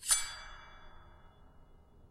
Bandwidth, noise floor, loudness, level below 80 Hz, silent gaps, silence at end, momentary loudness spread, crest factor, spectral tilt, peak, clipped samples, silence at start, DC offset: 16 kHz; -59 dBFS; -33 LUFS; -56 dBFS; none; 0.05 s; 28 LU; 26 dB; 1.5 dB/octave; -14 dBFS; under 0.1%; 0 s; under 0.1%